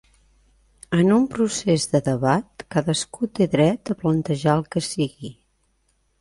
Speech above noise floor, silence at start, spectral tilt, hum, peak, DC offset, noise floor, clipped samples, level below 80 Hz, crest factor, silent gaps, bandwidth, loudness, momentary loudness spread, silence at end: 46 dB; 0.9 s; -5.5 dB/octave; none; -4 dBFS; under 0.1%; -67 dBFS; under 0.1%; -54 dBFS; 18 dB; none; 11.5 kHz; -22 LUFS; 8 LU; 0.9 s